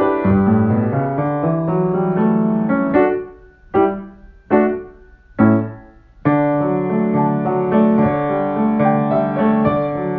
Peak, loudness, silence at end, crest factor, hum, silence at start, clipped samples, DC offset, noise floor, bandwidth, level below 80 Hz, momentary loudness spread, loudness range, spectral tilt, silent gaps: 0 dBFS; -17 LUFS; 0 s; 16 dB; none; 0 s; under 0.1%; under 0.1%; -43 dBFS; 3.8 kHz; -44 dBFS; 5 LU; 2 LU; -12 dB/octave; none